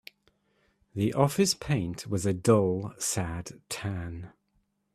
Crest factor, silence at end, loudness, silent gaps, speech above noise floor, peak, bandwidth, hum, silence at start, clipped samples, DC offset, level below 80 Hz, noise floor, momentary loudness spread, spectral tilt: 22 dB; 0.65 s; -28 LUFS; none; 45 dB; -8 dBFS; 15 kHz; none; 0.95 s; under 0.1%; under 0.1%; -56 dBFS; -73 dBFS; 16 LU; -5 dB/octave